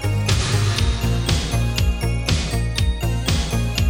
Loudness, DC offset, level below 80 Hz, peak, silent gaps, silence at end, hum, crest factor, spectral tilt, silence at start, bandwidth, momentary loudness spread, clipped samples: -21 LUFS; under 0.1%; -24 dBFS; -4 dBFS; none; 0 s; none; 14 dB; -4.5 dB/octave; 0 s; 17 kHz; 3 LU; under 0.1%